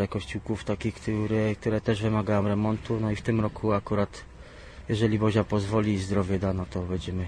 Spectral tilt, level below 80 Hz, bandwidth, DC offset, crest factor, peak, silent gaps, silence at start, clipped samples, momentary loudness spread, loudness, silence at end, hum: -7.5 dB/octave; -46 dBFS; 10 kHz; under 0.1%; 16 dB; -12 dBFS; none; 0 s; under 0.1%; 8 LU; -27 LUFS; 0 s; none